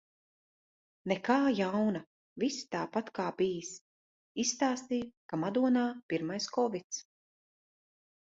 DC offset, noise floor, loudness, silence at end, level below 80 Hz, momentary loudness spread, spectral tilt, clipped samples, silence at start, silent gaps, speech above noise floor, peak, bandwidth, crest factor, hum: under 0.1%; under -90 dBFS; -33 LUFS; 1.25 s; -74 dBFS; 13 LU; -4.5 dB/octave; under 0.1%; 1.05 s; 2.07-2.36 s, 3.81-4.35 s, 5.17-5.29 s, 6.03-6.09 s, 6.84-6.90 s; over 58 dB; -14 dBFS; 8 kHz; 20 dB; none